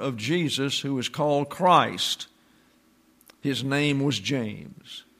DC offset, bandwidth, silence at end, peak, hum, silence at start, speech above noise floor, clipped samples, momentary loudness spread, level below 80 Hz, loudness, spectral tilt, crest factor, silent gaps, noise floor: under 0.1%; 15.5 kHz; 0.2 s; -6 dBFS; none; 0 s; 36 dB; under 0.1%; 16 LU; -68 dBFS; -25 LUFS; -4.5 dB/octave; 22 dB; none; -61 dBFS